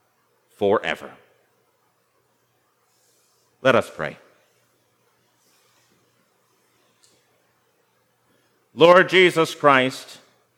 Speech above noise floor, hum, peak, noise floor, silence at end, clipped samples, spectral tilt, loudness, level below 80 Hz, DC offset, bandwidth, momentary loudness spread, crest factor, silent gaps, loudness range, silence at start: 48 dB; 60 Hz at -70 dBFS; 0 dBFS; -66 dBFS; 0.55 s; under 0.1%; -4.5 dB/octave; -18 LUFS; -72 dBFS; under 0.1%; 15.5 kHz; 22 LU; 24 dB; none; 11 LU; 0.6 s